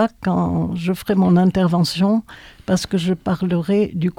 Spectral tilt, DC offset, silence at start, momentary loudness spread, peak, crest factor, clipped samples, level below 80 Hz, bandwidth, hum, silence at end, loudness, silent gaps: -7 dB/octave; under 0.1%; 0 s; 7 LU; -6 dBFS; 14 dB; under 0.1%; -46 dBFS; 15 kHz; none; 0.1 s; -19 LUFS; none